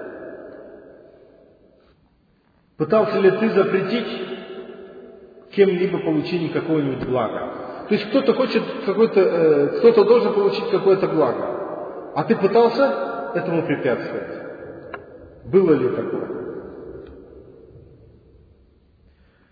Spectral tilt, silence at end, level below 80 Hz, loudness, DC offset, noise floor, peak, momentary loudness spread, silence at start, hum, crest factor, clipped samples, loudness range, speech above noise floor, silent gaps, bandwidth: -8.5 dB/octave; 1.7 s; -58 dBFS; -20 LUFS; under 0.1%; -60 dBFS; -2 dBFS; 21 LU; 0 s; none; 18 dB; under 0.1%; 7 LU; 42 dB; none; 5 kHz